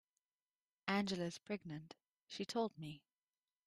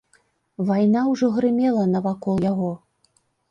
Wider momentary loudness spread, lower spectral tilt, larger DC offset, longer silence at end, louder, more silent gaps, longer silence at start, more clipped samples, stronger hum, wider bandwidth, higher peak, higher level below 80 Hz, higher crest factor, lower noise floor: first, 18 LU vs 8 LU; second, -5 dB/octave vs -8.5 dB/octave; neither; about the same, 0.7 s vs 0.75 s; second, -44 LUFS vs -21 LUFS; neither; first, 0.85 s vs 0.6 s; neither; neither; first, 13.5 kHz vs 7.2 kHz; second, -22 dBFS vs -8 dBFS; second, -80 dBFS vs -60 dBFS; first, 24 dB vs 14 dB; first, under -90 dBFS vs -65 dBFS